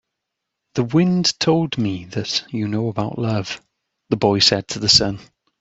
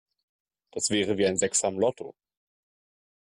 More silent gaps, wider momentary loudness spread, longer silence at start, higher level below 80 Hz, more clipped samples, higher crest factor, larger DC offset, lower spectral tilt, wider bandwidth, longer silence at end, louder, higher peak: neither; second, 12 LU vs 17 LU; about the same, 0.75 s vs 0.75 s; first, -50 dBFS vs -68 dBFS; neither; about the same, 20 dB vs 18 dB; neither; first, -4.5 dB/octave vs -3 dB/octave; second, 8.2 kHz vs 12 kHz; second, 0.4 s vs 1.15 s; first, -19 LUFS vs -26 LUFS; first, 0 dBFS vs -12 dBFS